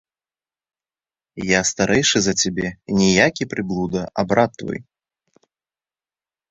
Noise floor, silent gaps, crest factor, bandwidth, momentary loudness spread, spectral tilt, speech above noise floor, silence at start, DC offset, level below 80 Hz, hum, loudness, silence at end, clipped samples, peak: under -90 dBFS; none; 20 dB; 8.2 kHz; 12 LU; -3.5 dB/octave; over 71 dB; 1.35 s; under 0.1%; -50 dBFS; none; -19 LUFS; 1.7 s; under 0.1%; -2 dBFS